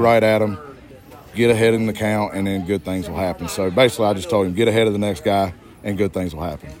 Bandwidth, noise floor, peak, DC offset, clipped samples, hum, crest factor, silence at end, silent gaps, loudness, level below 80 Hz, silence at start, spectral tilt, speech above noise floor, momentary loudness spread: 16.5 kHz; -42 dBFS; -2 dBFS; under 0.1%; under 0.1%; none; 18 dB; 0 s; none; -19 LUFS; -48 dBFS; 0 s; -5.5 dB/octave; 23 dB; 12 LU